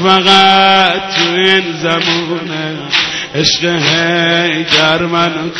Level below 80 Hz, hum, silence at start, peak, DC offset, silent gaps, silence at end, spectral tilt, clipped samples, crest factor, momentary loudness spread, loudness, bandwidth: -48 dBFS; none; 0 s; 0 dBFS; under 0.1%; none; 0 s; -3.5 dB/octave; under 0.1%; 12 dB; 9 LU; -10 LUFS; 10.5 kHz